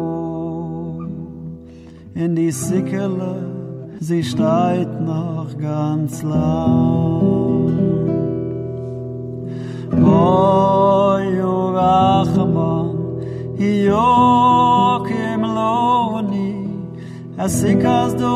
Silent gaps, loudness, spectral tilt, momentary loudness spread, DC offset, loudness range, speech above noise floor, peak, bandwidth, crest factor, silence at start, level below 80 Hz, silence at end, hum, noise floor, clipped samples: none; -17 LUFS; -7 dB/octave; 15 LU; under 0.1%; 6 LU; 22 dB; -4 dBFS; 14 kHz; 14 dB; 0 s; -44 dBFS; 0 s; none; -38 dBFS; under 0.1%